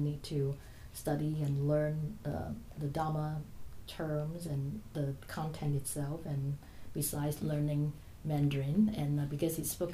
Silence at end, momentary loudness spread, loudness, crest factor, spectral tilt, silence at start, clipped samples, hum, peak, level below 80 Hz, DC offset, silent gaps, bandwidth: 0 s; 11 LU; -36 LUFS; 16 dB; -6.5 dB/octave; 0 s; under 0.1%; none; -20 dBFS; -54 dBFS; under 0.1%; none; 15.5 kHz